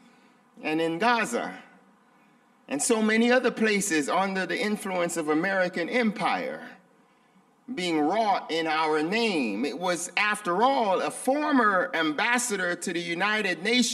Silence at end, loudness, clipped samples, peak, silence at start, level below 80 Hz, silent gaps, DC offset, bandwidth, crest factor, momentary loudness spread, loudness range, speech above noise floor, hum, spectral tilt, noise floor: 0 s; -25 LUFS; under 0.1%; -8 dBFS; 0.55 s; -76 dBFS; none; under 0.1%; 15 kHz; 18 dB; 8 LU; 4 LU; 36 dB; none; -3.5 dB/octave; -61 dBFS